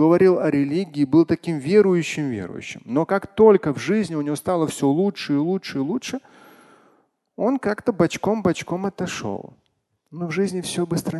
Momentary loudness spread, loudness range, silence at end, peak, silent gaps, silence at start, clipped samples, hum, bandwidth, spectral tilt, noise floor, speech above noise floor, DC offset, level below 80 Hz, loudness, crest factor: 12 LU; 5 LU; 0 s; -2 dBFS; none; 0 s; under 0.1%; none; 12.5 kHz; -6.5 dB/octave; -71 dBFS; 50 dB; under 0.1%; -56 dBFS; -21 LUFS; 20 dB